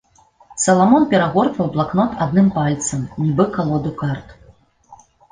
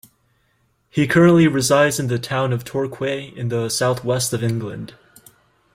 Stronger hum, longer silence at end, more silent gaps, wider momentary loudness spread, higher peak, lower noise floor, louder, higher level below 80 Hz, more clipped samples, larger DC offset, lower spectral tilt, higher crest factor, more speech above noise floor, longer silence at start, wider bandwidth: neither; second, 0.35 s vs 0.9 s; neither; second, 10 LU vs 13 LU; about the same, -2 dBFS vs -2 dBFS; second, -50 dBFS vs -64 dBFS; about the same, -17 LUFS vs -19 LUFS; first, -48 dBFS vs -54 dBFS; neither; neither; about the same, -6 dB/octave vs -5 dB/octave; about the same, 16 dB vs 16 dB; second, 34 dB vs 46 dB; second, 0.5 s vs 0.95 s; second, 10 kHz vs 16.5 kHz